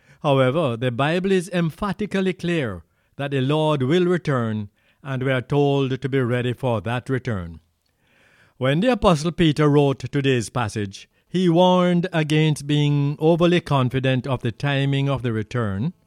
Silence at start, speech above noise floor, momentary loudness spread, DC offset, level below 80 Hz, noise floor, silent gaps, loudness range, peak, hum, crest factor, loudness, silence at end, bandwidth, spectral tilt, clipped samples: 0.25 s; 44 dB; 9 LU; under 0.1%; -48 dBFS; -64 dBFS; none; 4 LU; -4 dBFS; none; 18 dB; -21 LUFS; 0.15 s; 12 kHz; -7 dB/octave; under 0.1%